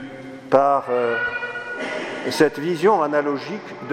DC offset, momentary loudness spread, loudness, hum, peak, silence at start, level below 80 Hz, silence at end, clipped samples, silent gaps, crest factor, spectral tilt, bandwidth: under 0.1%; 13 LU; -21 LUFS; none; 0 dBFS; 0 s; -64 dBFS; 0 s; under 0.1%; none; 20 dB; -5 dB/octave; 16 kHz